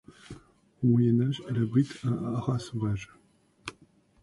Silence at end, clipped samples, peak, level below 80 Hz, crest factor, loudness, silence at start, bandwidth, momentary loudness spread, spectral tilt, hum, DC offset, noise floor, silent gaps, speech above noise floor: 0.5 s; under 0.1%; -12 dBFS; -58 dBFS; 16 dB; -28 LUFS; 0.3 s; 11.5 kHz; 24 LU; -8 dB/octave; none; under 0.1%; -61 dBFS; none; 35 dB